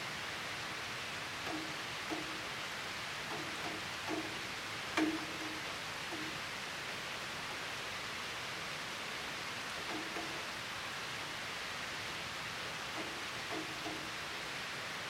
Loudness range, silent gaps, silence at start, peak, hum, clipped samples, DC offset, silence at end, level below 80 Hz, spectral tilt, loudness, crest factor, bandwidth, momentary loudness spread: 1 LU; none; 0 s; -20 dBFS; none; under 0.1%; under 0.1%; 0 s; -68 dBFS; -2.5 dB/octave; -40 LUFS; 22 dB; 16 kHz; 1 LU